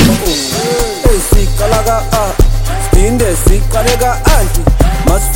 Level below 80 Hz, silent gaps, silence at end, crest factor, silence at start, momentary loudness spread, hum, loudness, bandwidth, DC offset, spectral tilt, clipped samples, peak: -12 dBFS; none; 0 s; 10 dB; 0 s; 3 LU; none; -12 LUFS; 17.5 kHz; under 0.1%; -4.5 dB/octave; 0.3%; 0 dBFS